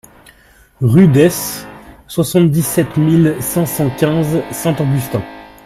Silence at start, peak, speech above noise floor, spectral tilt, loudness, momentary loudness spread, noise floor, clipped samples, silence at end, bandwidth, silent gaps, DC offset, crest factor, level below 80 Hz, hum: 0.8 s; 0 dBFS; 34 dB; -6.5 dB/octave; -14 LUFS; 13 LU; -47 dBFS; under 0.1%; 0.2 s; 16 kHz; none; under 0.1%; 14 dB; -44 dBFS; none